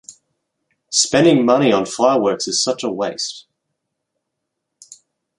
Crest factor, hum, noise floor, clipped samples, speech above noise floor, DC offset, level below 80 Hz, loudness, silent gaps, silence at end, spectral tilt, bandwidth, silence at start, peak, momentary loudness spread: 18 dB; none; -78 dBFS; under 0.1%; 62 dB; under 0.1%; -62 dBFS; -16 LUFS; none; 2 s; -3.5 dB/octave; 11.5 kHz; 0.1 s; -2 dBFS; 11 LU